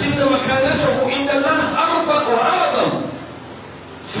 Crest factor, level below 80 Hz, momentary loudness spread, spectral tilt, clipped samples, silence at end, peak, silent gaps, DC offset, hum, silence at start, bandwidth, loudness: 14 dB; -46 dBFS; 19 LU; -9.5 dB/octave; under 0.1%; 0 s; -4 dBFS; none; under 0.1%; none; 0 s; 4 kHz; -17 LUFS